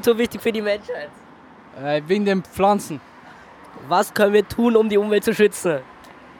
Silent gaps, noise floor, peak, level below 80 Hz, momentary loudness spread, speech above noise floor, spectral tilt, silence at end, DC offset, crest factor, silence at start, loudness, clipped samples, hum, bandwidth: none; -45 dBFS; -4 dBFS; -56 dBFS; 15 LU; 26 dB; -5 dB/octave; 0.3 s; under 0.1%; 18 dB; 0 s; -20 LUFS; under 0.1%; none; 19.5 kHz